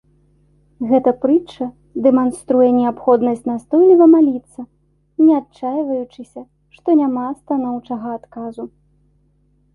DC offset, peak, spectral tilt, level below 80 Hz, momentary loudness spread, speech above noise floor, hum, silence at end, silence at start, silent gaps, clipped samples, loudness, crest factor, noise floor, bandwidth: under 0.1%; -2 dBFS; -7.5 dB/octave; -58 dBFS; 19 LU; 43 dB; 50 Hz at -50 dBFS; 1.05 s; 0.8 s; none; under 0.1%; -16 LUFS; 16 dB; -58 dBFS; 11.5 kHz